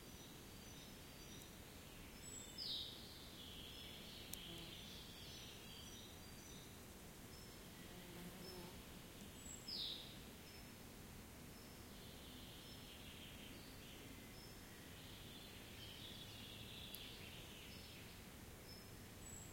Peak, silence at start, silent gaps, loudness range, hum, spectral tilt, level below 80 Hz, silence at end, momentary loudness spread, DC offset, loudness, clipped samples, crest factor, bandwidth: -28 dBFS; 0 s; none; 5 LU; none; -3 dB/octave; -66 dBFS; 0 s; 7 LU; under 0.1%; -54 LUFS; under 0.1%; 28 dB; 16.5 kHz